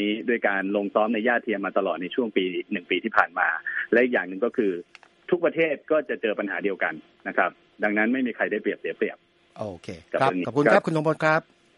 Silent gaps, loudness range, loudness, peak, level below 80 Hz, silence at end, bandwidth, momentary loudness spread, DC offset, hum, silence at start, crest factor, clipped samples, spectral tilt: none; 2 LU; -24 LUFS; -2 dBFS; -70 dBFS; 0.35 s; 11 kHz; 9 LU; under 0.1%; none; 0 s; 24 dB; under 0.1%; -6.5 dB/octave